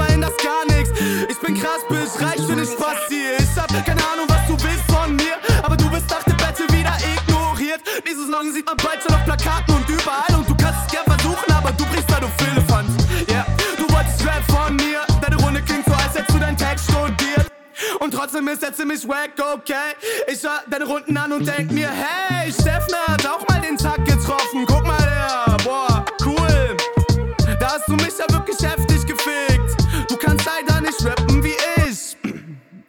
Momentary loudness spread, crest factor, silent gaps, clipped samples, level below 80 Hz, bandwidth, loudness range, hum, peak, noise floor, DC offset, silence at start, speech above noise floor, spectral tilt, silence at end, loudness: 5 LU; 14 dB; none; under 0.1%; -26 dBFS; 19.5 kHz; 3 LU; none; -4 dBFS; -38 dBFS; under 0.1%; 0 s; 18 dB; -5 dB/octave; 0.1 s; -19 LUFS